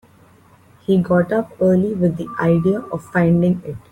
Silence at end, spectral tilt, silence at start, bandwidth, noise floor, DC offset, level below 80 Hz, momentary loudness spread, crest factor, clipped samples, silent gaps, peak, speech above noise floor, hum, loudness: 0.15 s; -9.5 dB/octave; 0.9 s; 9.4 kHz; -50 dBFS; under 0.1%; -50 dBFS; 7 LU; 14 dB; under 0.1%; none; -4 dBFS; 33 dB; none; -18 LUFS